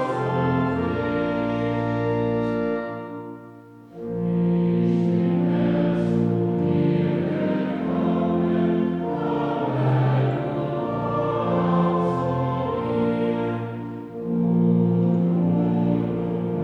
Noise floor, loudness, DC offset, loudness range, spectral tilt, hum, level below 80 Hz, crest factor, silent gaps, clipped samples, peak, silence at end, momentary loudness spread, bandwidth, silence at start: -44 dBFS; -23 LUFS; under 0.1%; 3 LU; -10 dB/octave; none; -52 dBFS; 14 dB; none; under 0.1%; -8 dBFS; 0 s; 7 LU; 4.9 kHz; 0 s